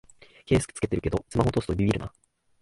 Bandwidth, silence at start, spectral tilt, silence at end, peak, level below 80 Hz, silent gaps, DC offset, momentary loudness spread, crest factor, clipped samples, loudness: 11.5 kHz; 0.5 s; -6.5 dB/octave; 0.55 s; -10 dBFS; -42 dBFS; none; under 0.1%; 4 LU; 18 dB; under 0.1%; -27 LUFS